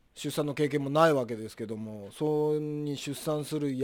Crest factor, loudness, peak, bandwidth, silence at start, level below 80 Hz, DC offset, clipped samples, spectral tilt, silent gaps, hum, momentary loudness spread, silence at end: 22 dB; -30 LUFS; -8 dBFS; 19 kHz; 0.15 s; -66 dBFS; under 0.1%; under 0.1%; -6 dB/octave; none; none; 13 LU; 0 s